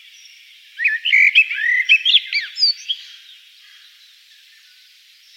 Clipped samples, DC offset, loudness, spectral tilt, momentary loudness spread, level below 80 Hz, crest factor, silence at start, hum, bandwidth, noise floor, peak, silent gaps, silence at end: under 0.1%; under 0.1%; -14 LUFS; 11.5 dB/octave; 12 LU; under -90 dBFS; 18 dB; 0.75 s; none; 16.5 kHz; -49 dBFS; -2 dBFS; none; 2.3 s